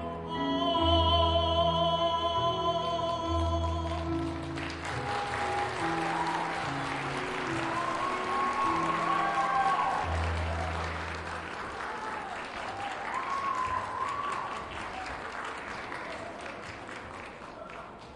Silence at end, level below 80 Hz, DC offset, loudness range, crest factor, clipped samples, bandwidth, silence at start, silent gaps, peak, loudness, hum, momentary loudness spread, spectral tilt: 0 s; -48 dBFS; under 0.1%; 8 LU; 18 dB; under 0.1%; 11.5 kHz; 0 s; none; -14 dBFS; -31 LUFS; none; 12 LU; -5 dB/octave